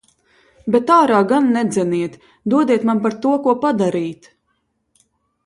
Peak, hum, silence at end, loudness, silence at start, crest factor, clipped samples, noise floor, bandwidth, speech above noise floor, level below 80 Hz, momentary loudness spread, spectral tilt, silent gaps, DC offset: 0 dBFS; none; 1.3 s; -17 LUFS; 0.65 s; 18 dB; under 0.1%; -68 dBFS; 11.5 kHz; 52 dB; -62 dBFS; 13 LU; -6.5 dB/octave; none; under 0.1%